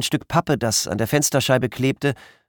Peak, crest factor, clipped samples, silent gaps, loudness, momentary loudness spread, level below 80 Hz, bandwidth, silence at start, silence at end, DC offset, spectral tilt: -4 dBFS; 18 dB; under 0.1%; none; -20 LUFS; 4 LU; -50 dBFS; 19 kHz; 0 s; 0.35 s; under 0.1%; -4 dB/octave